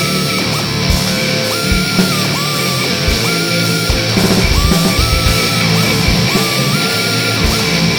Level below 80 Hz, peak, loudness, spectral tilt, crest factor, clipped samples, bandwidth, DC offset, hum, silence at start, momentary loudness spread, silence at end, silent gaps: -24 dBFS; 0 dBFS; -12 LUFS; -4 dB/octave; 14 dB; under 0.1%; over 20 kHz; under 0.1%; none; 0 s; 2 LU; 0 s; none